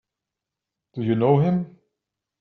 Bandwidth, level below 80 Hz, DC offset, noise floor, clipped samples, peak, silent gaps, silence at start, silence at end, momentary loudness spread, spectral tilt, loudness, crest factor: 4.3 kHz; -64 dBFS; under 0.1%; -86 dBFS; under 0.1%; -6 dBFS; none; 0.95 s; 0.75 s; 19 LU; -8.5 dB/octave; -22 LUFS; 20 dB